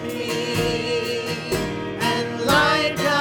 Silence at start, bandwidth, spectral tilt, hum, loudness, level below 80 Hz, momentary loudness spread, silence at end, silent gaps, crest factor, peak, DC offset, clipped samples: 0 s; over 20 kHz; -4 dB/octave; none; -21 LUFS; -46 dBFS; 8 LU; 0 s; none; 18 dB; -4 dBFS; under 0.1%; under 0.1%